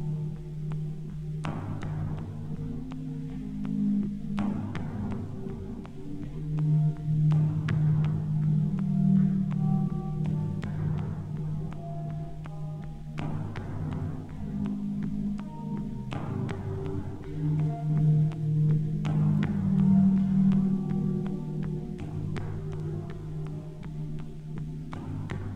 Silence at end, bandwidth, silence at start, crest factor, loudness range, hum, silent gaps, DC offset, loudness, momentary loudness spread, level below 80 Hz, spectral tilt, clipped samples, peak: 0 s; 4.3 kHz; 0 s; 16 dB; 10 LU; none; none; under 0.1%; -30 LUFS; 13 LU; -46 dBFS; -9.5 dB/octave; under 0.1%; -12 dBFS